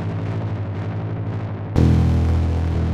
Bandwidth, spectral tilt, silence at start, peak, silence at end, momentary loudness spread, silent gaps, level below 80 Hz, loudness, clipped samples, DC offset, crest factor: 7.4 kHz; -9 dB/octave; 0 s; -4 dBFS; 0 s; 10 LU; none; -28 dBFS; -21 LUFS; under 0.1%; under 0.1%; 16 dB